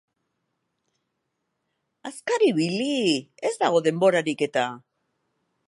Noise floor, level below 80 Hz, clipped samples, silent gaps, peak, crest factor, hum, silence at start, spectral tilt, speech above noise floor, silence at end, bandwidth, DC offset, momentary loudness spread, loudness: -78 dBFS; -80 dBFS; under 0.1%; none; -6 dBFS; 20 dB; none; 2.05 s; -4.5 dB/octave; 55 dB; 0.9 s; 11.5 kHz; under 0.1%; 10 LU; -23 LUFS